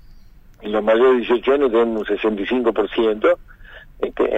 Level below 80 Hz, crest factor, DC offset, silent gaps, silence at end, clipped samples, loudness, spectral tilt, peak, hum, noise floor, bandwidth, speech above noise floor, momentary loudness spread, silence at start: -44 dBFS; 14 dB; under 0.1%; none; 0 s; under 0.1%; -18 LUFS; -6.5 dB/octave; -4 dBFS; none; -44 dBFS; 5.6 kHz; 26 dB; 10 LU; 0.15 s